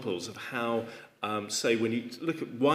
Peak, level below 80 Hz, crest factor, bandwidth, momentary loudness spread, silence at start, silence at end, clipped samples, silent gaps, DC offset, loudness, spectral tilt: -12 dBFS; -80 dBFS; 20 dB; 15.5 kHz; 8 LU; 0 s; 0 s; under 0.1%; none; under 0.1%; -32 LUFS; -4 dB/octave